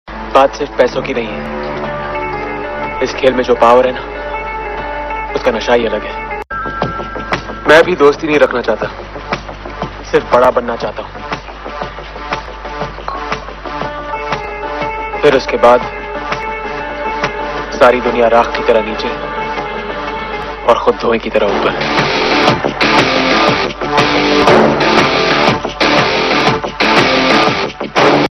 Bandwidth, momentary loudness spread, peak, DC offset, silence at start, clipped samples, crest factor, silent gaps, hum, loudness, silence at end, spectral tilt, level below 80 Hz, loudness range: 12.5 kHz; 13 LU; 0 dBFS; under 0.1%; 0.05 s; 0.3%; 14 dB; none; none; -13 LUFS; 0 s; -4.5 dB/octave; -34 dBFS; 7 LU